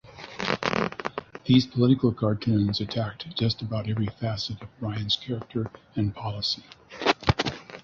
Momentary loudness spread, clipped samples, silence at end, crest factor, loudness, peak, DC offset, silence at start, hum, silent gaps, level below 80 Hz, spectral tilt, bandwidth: 11 LU; under 0.1%; 0.05 s; 22 dB; -27 LUFS; -4 dBFS; under 0.1%; 0.05 s; none; none; -48 dBFS; -6.5 dB/octave; 7.4 kHz